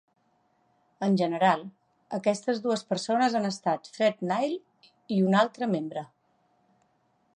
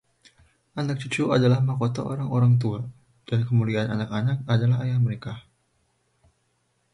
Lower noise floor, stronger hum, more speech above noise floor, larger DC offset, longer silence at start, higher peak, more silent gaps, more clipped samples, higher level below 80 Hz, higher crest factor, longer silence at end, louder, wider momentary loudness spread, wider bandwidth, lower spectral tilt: about the same, -70 dBFS vs -70 dBFS; neither; second, 43 dB vs 47 dB; neither; first, 1 s vs 0.75 s; about the same, -10 dBFS vs -8 dBFS; neither; neither; second, -80 dBFS vs -58 dBFS; about the same, 18 dB vs 16 dB; second, 1.3 s vs 1.55 s; second, -27 LUFS vs -24 LUFS; about the same, 13 LU vs 14 LU; about the same, 10.5 kHz vs 10.5 kHz; second, -6 dB/octave vs -7.5 dB/octave